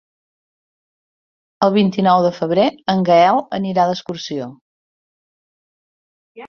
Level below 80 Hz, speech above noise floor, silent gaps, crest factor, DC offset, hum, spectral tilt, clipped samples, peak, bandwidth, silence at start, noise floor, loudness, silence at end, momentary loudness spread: -62 dBFS; over 74 dB; 4.61-6.35 s; 18 dB; under 0.1%; none; -6.5 dB/octave; under 0.1%; 0 dBFS; 6.8 kHz; 1.6 s; under -90 dBFS; -16 LUFS; 0 s; 13 LU